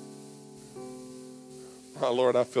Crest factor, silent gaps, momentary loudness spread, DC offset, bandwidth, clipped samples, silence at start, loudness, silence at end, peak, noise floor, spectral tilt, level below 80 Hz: 18 dB; none; 22 LU; under 0.1%; 11 kHz; under 0.1%; 0 s; -27 LUFS; 0 s; -14 dBFS; -48 dBFS; -5 dB/octave; -74 dBFS